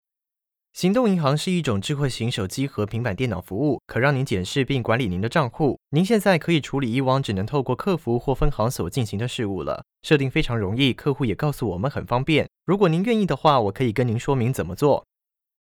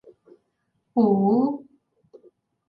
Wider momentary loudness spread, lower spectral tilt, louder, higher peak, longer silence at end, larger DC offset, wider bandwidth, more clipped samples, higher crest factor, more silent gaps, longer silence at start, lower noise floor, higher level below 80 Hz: second, 7 LU vs 10 LU; second, -6.5 dB/octave vs -13 dB/octave; about the same, -23 LUFS vs -22 LUFS; first, -4 dBFS vs -8 dBFS; second, 0.6 s vs 1.1 s; neither; first, 17.5 kHz vs 4.9 kHz; neither; about the same, 18 dB vs 18 dB; neither; second, 0.75 s vs 0.95 s; first, -88 dBFS vs -74 dBFS; first, -40 dBFS vs -70 dBFS